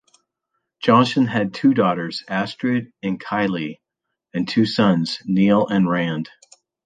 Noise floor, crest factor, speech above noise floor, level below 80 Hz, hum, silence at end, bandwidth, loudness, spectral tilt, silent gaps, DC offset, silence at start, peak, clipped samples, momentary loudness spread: -81 dBFS; 18 dB; 62 dB; -60 dBFS; none; 0.6 s; 9.2 kHz; -20 LUFS; -7 dB/octave; none; under 0.1%; 0.8 s; -2 dBFS; under 0.1%; 11 LU